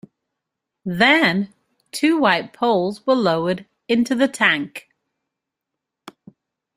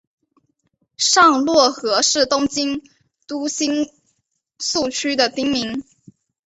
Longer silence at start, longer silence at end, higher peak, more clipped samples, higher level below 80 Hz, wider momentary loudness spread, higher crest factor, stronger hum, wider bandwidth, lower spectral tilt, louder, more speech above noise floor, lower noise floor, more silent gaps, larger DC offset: second, 0.85 s vs 1 s; first, 1.95 s vs 0.65 s; about the same, -2 dBFS vs -2 dBFS; neither; second, -62 dBFS vs -56 dBFS; about the same, 16 LU vs 14 LU; about the same, 20 dB vs 18 dB; neither; first, 15.5 kHz vs 8.4 kHz; first, -5 dB/octave vs -1.5 dB/octave; about the same, -18 LUFS vs -17 LUFS; first, 64 dB vs 52 dB; first, -83 dBFS vs -70 dBFS; neither; neither